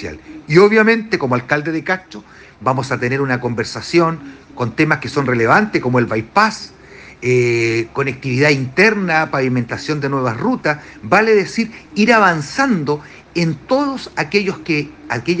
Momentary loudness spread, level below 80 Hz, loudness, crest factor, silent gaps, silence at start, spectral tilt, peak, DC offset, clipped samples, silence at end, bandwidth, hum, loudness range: 11 LU; -50 dBFS; -16 LUFS; 16 dB; none; 0 s; -6 dB/octave; 0 dBFS; under 0.1%; under 0.1%; 0 s; 9.8 kHz; none; 3 LU